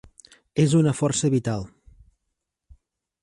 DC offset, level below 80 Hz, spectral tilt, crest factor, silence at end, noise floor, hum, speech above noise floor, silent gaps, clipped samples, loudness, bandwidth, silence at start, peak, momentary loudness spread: under 0.1%; -54 dBFS; -6 dB/octave; 18 dB; 1.55 s; -80 dBFS; none; 59 dB; none; under 0.1%; -22 LUFS; 11.5 kHz; 0.55 s; -8 dBFS; 12 LU